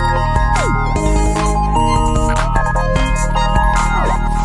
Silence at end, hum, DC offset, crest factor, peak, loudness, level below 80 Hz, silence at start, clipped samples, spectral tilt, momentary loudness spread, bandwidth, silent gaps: 0 s; none; under 0.1%; 12 dB; -2 dBFS; -16 LUFS; -16 dBFS; 0 s; under 0.1%; -5.5 dB/octave; 2 LU; 11.5 kHz; none